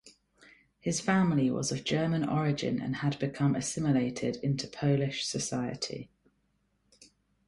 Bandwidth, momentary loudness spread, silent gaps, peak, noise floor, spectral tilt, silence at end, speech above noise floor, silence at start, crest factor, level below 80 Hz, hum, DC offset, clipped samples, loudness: 11.5 kHz; 7 LU; none; -14 dBFS; -74 dBFS; -5.5 dB/octave; 1.45 s; 44 dB; 0.05 s; 18 dB; -62 dBFS; none; under 0.1%; under 0.1%; -30 LUFS